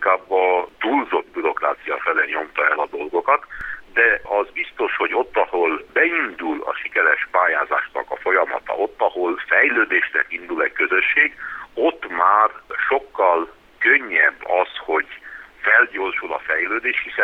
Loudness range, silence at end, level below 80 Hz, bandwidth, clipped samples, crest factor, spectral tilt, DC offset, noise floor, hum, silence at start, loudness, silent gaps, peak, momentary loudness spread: 2 LU; 0 s; -56 dBFS; 6.4 kHz; under 0.1%; 18 dB; -4.5 dB/octave; under 0.1%; -39 dBFS; none; 0 s; -19 LUFS; none; -2 dBFS; 9 LU